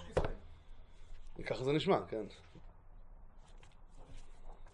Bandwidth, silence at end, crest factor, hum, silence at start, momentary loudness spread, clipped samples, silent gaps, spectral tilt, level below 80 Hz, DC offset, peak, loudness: 10.5 kHz; 0.05 s; 24 dB; none; 0 s; 27 LU; under 0.1%; none; -6.5 dB/octave; -52 dBFS; under 0.1%; -18 dBFS; -37 LUFS